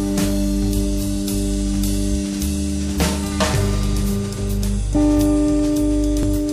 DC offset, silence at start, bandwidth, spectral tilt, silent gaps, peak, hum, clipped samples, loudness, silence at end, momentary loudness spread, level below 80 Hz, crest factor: under 0.1%; 0 s; 15.5 kHz; -5.5 dB/octave; none; -6 dBFS; none; under 0.1%; -20 LUFS; 0 s; 5 LU; -24 dBFS; 12 dB